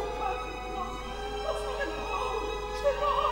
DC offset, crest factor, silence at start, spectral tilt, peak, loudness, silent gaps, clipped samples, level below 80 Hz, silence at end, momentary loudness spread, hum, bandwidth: under 0.1%; 16 dB; 0 s; -4 dB/octave; -14 dBFS; -32 LUFS; none; under 0.1%; -42 dBFS; 0 s; 8 LU; none; 16.5 kHz